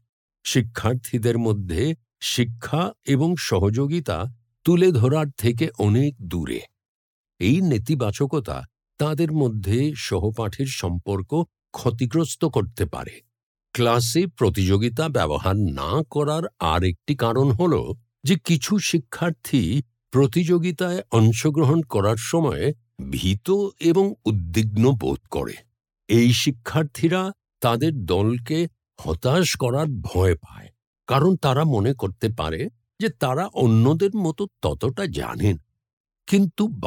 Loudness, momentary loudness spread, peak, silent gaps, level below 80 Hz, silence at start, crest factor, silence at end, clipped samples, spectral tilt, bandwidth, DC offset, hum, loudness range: -22 LUFS; 9 LU; -6 dBFS; 6.88-7.24 s, 13.43-13.55 s, 30.87-30.93 s, 35.93-36.04 s; -46 dBFS; 0.45 s; 16 dB; 0 s; under 0.1%; -6 dB/octave; 19 kHz; under 0.1%; none; 3 LU